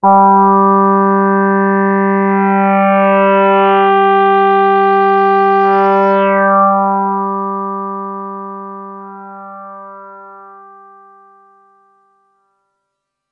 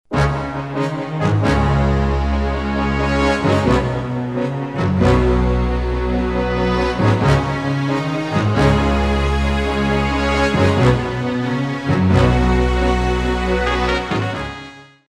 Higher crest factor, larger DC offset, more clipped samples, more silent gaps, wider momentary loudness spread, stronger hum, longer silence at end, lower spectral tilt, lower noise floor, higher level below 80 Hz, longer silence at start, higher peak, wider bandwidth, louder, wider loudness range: about the same, 12 dB vs 16 dB; second, under 0.1% vs 0.2%; neither; neither; first, 20 LU vs 7 LU; first, 50 Hz at -75 dBFS vs none; first, 2.85 s vs 0.25 s; first, -9.5 dB/octave vs -7 dB/octave; first, -74 dBFS vs -37 dBFS; second, -70 dBFS vs -24 dBFS; about the same, 0.05 s vs 0.1 s; about the same, 0 dBFS vs 0 dBFS; second, 5 kHz vs 10.5 kHz; first, -11 LUFS vs -18 LUFS; first, 17 LU vs 2 LU